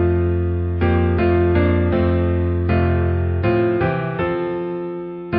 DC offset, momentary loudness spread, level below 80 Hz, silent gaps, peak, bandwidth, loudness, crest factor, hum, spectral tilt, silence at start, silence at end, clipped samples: under 0.1%; 7 LU; -26 dBFS; none; -4 dBFS; 4.9 kHz; -19 LUFS; 14 dB; none; -13.5 dB/octave; 0 s; 0 s; under 0.1%